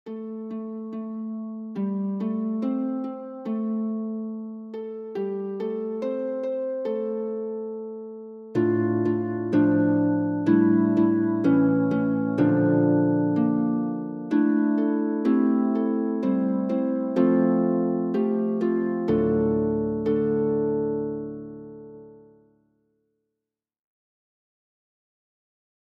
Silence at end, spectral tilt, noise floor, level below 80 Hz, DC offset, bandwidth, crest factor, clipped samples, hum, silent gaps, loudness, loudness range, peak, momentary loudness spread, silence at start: 3.7 s; -10.5 dB/octave; -87 dBFS; -60 dBFS; under 0.1%; 5 kHz; 16 dB; under 0.1%; none; none; -24 LUFS; 9 LU; -8 dBFS; 13 LU; 0.05 s